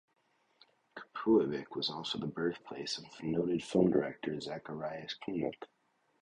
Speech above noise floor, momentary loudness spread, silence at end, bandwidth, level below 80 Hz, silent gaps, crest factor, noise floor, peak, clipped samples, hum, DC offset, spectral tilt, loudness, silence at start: 34 dB; 13 LU; 0.55 s; 10.5 kHz; -70 dBFS; none; 20 dB; -68 dBFS; -14 dBFS; under 0.1%; none; under 0.1%; -6 dB/octave; -35 LUFS; 0.95 s